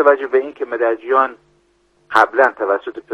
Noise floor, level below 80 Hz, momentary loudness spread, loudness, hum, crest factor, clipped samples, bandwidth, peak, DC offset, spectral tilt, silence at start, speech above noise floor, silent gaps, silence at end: -59 dBFS; -66 dBFS; 8 LU; -17 LUFS; none; 18 dB; 0.1%; 9 kHz; 0 dBFS; under 0.1%; -4 dB/octave; 0 s; 43 dB; none; 0 s